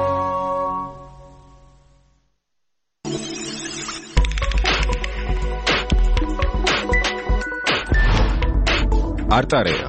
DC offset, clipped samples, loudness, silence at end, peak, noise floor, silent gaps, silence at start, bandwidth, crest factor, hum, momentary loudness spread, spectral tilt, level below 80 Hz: under 0.1%; under 0.1%; -21 LUFS; 0 s; -2 dBFS; -78 dBFS; none; 0 s; 8.8 kHz; 18 dB; none; 9 LU; -4.5 dB/octave; -22 dBFS